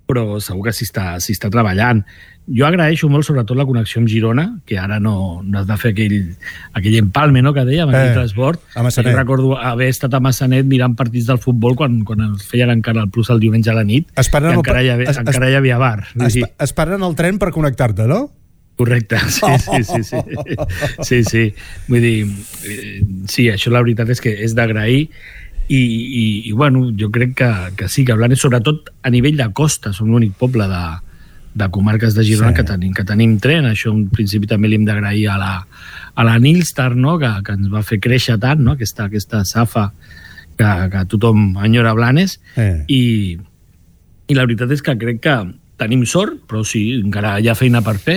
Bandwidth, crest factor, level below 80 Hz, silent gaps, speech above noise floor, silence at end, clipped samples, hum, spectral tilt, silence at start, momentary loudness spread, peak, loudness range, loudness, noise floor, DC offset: 18 kHz; 12 dB; -34 dBFS; none; 34 dB; 0 s; under 0.1%; none; -6 dB/octave; 0.1 s; 8 LU; -2 dBFS; 3 LU; -15 LUFS; -48 dBFS; under 0.1%